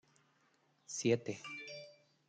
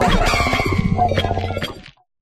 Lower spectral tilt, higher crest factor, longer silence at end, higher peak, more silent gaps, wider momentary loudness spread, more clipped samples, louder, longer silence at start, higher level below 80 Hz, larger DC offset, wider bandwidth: about the same, -4.5 dB/octave vs -5.5 dB/octave; first, 22 dB vs 16 dB; about the same, 0.35 s vs 0.3 s; second, -20 dBFS vs -4 dBFS; neither; first, 17 LU vs 11 LU; neither; second, -39 LUFS vs -19 LUFS; first, 0.9 s vs 0 s; second, -82 dBFS vs -26 dBFS; neither; second, 9.4 kHz vs 15.5 kHz